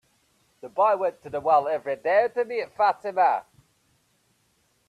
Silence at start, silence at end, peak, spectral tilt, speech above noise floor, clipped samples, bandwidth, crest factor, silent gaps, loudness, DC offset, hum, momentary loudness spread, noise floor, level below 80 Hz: 0.65 s; 1.45 s; -8 dBFS; -5 dB/octave; 44 dB; under 0.1%; 12 kHz; 18 dB; none; -24 LUFS; under 0.1%; none; 8 LU; -68 dBFS; -72 dBFS